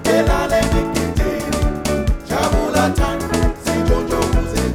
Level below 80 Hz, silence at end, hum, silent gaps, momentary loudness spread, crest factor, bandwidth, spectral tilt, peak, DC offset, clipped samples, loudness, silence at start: -22 dBFS; 0 s; none; none; 4 LU; 14 dB; 17.5 kHz; -5.5 dB/octave; -2 dBFS; under 0.1%; under 0.1%; -18 LUFS; 0 s